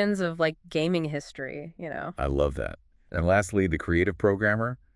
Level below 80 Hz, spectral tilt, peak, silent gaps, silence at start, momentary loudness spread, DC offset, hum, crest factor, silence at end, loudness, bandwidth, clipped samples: -42 dBFS; -6.5 dB/octave; -8 dBFS; none; 0 s; 13 LU; under 0.1%; none; 18 dB; 0.2 s; -27 LUFS; 12 kHz; under 0.1%